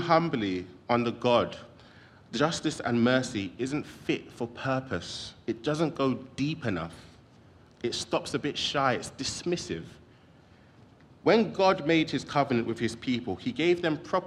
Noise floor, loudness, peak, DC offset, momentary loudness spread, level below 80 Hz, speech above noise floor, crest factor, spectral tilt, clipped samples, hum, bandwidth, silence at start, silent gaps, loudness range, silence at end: -56 dBFS; -29 LUFS; -10 dBFS; under 0.1%; 11 LU; -62 dBFS; 28 dB; 20 dB; -5 dB/octave; under 0.1%; none; 12 kHz; 0 s; none; 5 LU; 0 s